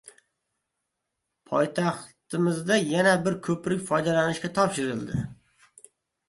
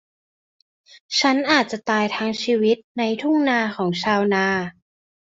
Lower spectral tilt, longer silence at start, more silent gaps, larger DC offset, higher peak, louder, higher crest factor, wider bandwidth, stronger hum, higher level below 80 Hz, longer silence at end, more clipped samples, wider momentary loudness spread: about the same, -5 dB/octave vs -4.5 dB/octave; second, 0.05 s vs 1.1 s; second, none vs 2.84-2.95 s; neither; second, -8 dBFS vs -2 dBFS; second, -26 LUFS vs -20 LUFS; about the same, 20 dB vs 20 dB; first, 11.5 kHz vs 8 kHz; neither; about the same, -60 dBFS vs -64 dBFS; first, 0.95 s vs 0.6 s; neither; first, 11 LU vs 5 LU